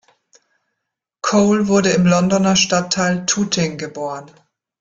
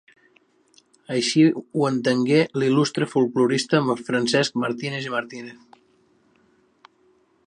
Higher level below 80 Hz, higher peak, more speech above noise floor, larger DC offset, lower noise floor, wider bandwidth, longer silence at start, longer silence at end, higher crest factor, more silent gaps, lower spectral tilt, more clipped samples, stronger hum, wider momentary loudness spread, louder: first, -54 dBFS vs -70 dBFS; about the same, -2 dBFS vs -4 dBFS; first, 63 dB vs 40 dB; neither; first, -79 dBFS vs -61 dBFS; second, 9.2 kHz vs 11 kHz; first, 1.25 s vs 1.1 s; second, 0.55 s vs 1.95 s; about the same, 16 dB vs 18 dB; neither; about the same, -4.5 dB/octave vs -5 dB/octave; neither; neither; first, 12 LU vs 9 LU; first, -16 LUFS vs -21 LUFS